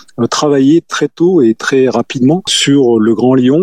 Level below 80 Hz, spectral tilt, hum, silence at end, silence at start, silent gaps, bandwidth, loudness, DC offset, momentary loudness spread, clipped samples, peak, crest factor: -60 dBFS; -5 dB/octave; none; 0 s; 0.2 s; none; 12.5 kHz; -10 LUFS; 0.4%; 4 LU; under 0.1%; 0 dBFS; 10 dB